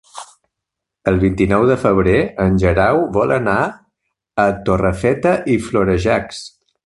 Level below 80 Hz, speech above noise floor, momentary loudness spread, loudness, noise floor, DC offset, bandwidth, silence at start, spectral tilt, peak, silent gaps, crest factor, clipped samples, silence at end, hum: -34 dBFS; 66 dB; 10 LU; -16 LUFS; -81 dBFS; under 0.1%; 11.5 kHz; 0.15 s; -7 dB/octave; 0 dBFS; none; 16 dB; under 0.1%; 0.4 s; none